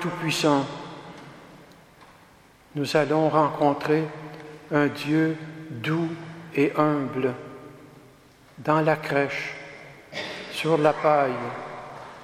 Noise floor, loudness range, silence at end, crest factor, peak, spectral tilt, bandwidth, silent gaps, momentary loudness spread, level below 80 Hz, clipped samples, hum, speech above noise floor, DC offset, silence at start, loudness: -54 dBFS; 4 LU; 0 s; 22 dB; -4 dBFS; -6 dB/octave; 15 kHz; none; 19 LU; -66 dBFS; under 0.1%; none; 30 dB; under 0.1%; 0 s; -24 LUFS